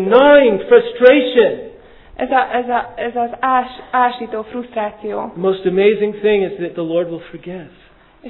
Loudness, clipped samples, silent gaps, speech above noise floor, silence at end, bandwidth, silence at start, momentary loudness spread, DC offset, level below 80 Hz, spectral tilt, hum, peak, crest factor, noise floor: -15 LUFS; under 0.1%; none; 24 dB; 0 s; 5.2 kHz; 0 s; 16 LU; under 0.1%; -50 dBFS; -8.5 dB/octave; none; 0 dBFS; 16 dB; -39 dBFS